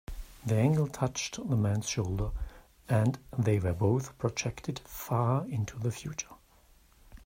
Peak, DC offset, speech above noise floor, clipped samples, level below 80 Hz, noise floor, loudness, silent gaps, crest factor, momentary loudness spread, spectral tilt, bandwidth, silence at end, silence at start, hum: -12 dBFS; under 0.1%; 31 dB; under 0.1%; -48 dBFS; -61 dBFS; -31 LUFS; none; 18 dB; 11 LU; -6 dB/octave; 16 kHz; 0.05 s; 0.1 s; none